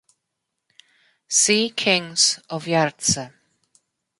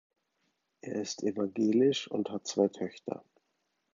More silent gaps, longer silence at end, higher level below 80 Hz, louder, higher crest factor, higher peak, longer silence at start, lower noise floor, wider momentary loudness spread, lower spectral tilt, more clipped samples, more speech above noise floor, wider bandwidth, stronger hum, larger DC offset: neither; first, 0.9 s vs 0.75 s; first, -58 dBFS vs -78 dBFS; first, -19 LUFS vs -32 LUFS; about the same, 20 dB vs 20 dB; first, -4 dBFS vs -12 dBFS; first, 1.3 s vs 0.85 s; about the same, -80 dBFS vs -80 dBFS; second, 8 LU vs 15 LU; second, -2 dB/octave vs -5 dB/octave; neither; first, 59 dB vs 49 dB; first, 11.5 kHz vs 7.6 kHz; neither; neither